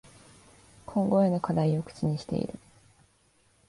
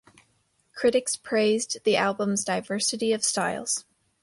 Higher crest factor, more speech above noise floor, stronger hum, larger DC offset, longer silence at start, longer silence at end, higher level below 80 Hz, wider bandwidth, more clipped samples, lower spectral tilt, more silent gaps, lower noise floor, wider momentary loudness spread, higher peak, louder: about the same, 18 dB vs 16 dB; second, 39 dB vs 43 dB; neither; neither; first, 0.9 s vs 0.75 s; first, 1.1 s vs 0.4 s; first, -60 dBFS vs -68 dBFS; about the same, 11.5 kHz vs 11.5 kHz; neither; first, -8.5 dB/octave vs -2.5 dB/octave; neither; about the same, -66 dBFS vs -69 dBFS; first, 14 LU vs 5 LU; about the same, -12 dBFS vs -10 dBFS; second, -28 LUFS vs -25 LUFS